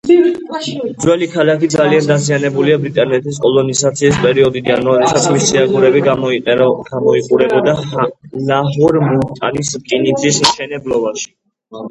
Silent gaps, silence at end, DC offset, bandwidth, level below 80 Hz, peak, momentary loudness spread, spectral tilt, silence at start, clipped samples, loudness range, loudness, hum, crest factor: none; 0 s; under 0.1%; 11.5 kHz; -48 dBFS; 0 dBFS; 8 LU; -4.5 dB/octave; 0.05 s; under 0.1%; 2 LU; -13 LUFS; none; 12 dB